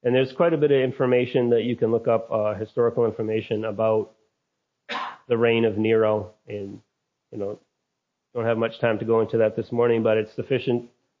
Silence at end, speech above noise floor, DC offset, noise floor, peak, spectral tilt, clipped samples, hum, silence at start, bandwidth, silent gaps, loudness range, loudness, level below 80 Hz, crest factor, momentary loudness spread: 0.35 s; 57 dB; under 0.1%; -80 dBFS; -8 dBFS; -8.5 dB/octave; under 0.1%; none; 0.05 s; 6.8 kHz; none; 4 LU; -23 LUFS; -62 dBFS; 16 dB; 13 LU